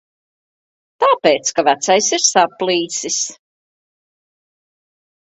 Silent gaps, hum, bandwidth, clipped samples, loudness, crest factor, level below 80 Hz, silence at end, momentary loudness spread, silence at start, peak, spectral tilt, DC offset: none; none; 8.4 kHz; under 0.1%; -15 LUFS; 18 dB; -66 dBFS; 1.9 s; 7 LU; 1 s; 0 dBFS; -1.5 dB/octave; under 0.1%